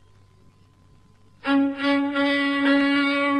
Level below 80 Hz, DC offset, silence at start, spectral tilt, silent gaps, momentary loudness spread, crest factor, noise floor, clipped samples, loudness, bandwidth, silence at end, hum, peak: -62 dBFS; under 0.1%; 1.45 s; -4.5 dB/octave; none; 4 LU; 14 dB; -54 dBFS; under 0.1%; -21 LUFS; 9.6 kHz; 0 s; none; -10 dBFS